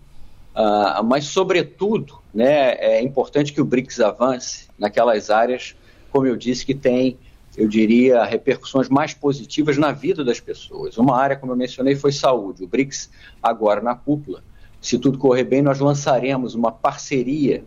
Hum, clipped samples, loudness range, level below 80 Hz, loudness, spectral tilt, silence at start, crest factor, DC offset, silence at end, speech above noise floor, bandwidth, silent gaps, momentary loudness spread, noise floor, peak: none; under 0.1%; 2 LU; -50 dBFS; -19 LUFS; -5.5 dB/octave; 0.15 s; 14 dB; under 0.1%; 0 s; 19 dB; 7.8 kHz; none; 8 LU; -38 dBFS; -4 dBFS